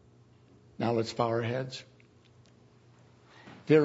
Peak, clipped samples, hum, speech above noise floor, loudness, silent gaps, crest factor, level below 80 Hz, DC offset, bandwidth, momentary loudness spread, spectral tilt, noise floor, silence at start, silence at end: -10 dBFS; under 0.1%; none; 29 dB; -31 LUFS; none; 22 dB; -72 dBFS; under 0.1%; 8 kHz; 21 LU; -7 dB/octave; -60 dBFS; 0.8 s; 0 s